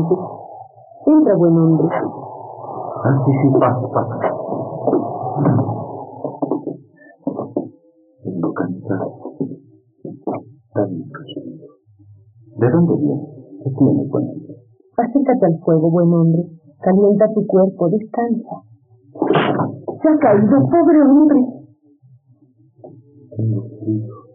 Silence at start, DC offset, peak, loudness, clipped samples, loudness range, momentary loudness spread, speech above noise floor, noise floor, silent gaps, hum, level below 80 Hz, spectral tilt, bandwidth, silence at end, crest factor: 0 s; under 0.1%; -4 dBFS; -17 LUFS; under 0.1%; 11 LU; 19 LU; 38 dB; -52 dBFS; none; none; -62 dBFS; -8.5 dB/octave; 3.7 kHz; 0.15 s; 14 dB